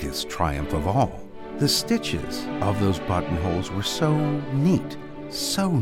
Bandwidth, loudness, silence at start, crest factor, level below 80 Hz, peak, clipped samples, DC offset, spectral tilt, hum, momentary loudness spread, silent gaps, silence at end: 16.5 kHz; -24 LUFS; 0 s; 18 dB; -40 dBFS; -6 dBFS; under 0.1%; under 0.1%; -5 dB/octave; none; 8 LU; none; 0 s